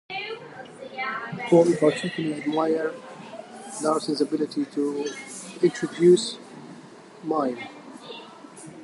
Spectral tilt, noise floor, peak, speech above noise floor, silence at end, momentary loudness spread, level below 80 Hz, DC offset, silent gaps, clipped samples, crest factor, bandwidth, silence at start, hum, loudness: -5.5 dB/octave; -46 dBFS; -6 dBFS; 22 dB; 0 s; 22 LU; -72 dBFS; under 0.1%; none; under 0.1%; 20 dB; 11.5 kHz; 0.1 s; none; -24 LUFS